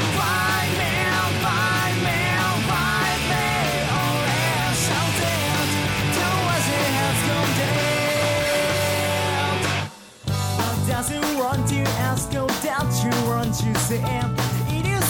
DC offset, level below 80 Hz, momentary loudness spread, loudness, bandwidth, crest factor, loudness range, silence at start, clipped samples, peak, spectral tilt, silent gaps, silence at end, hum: under 0.1%; -42 dBFS; 3 LU; -21 LUFS; 18.5 kHz; 14 dB; 2 LU; 0 s; under 0.1%; -8 dBFS; -4 dB/octave; none; 0 s; none